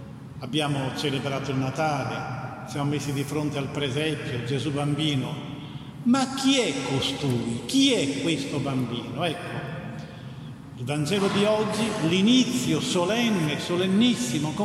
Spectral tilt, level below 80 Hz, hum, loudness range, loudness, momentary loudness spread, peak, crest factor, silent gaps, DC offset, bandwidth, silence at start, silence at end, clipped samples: -5 dB/octave; -58 dBFS; none; 5 LU; -25 LUFS; 14 LU; -10 dBFS; 16 dB; none; under 0.1%; 15 kHz; 0 s; 0 s; under 0.1%